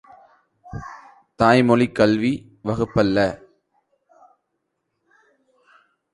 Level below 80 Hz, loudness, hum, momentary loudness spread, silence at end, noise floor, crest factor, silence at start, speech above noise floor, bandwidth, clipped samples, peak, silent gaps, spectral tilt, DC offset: -50 dBFS; -19 LUFS; none; 21 LU; 2.8 s; -76 dBFS; 20 dB; 0.65 s; 58 dB; 11 kHz; under 0.1%; -2 dBFS; none; -7 dB/octave; under 0.1%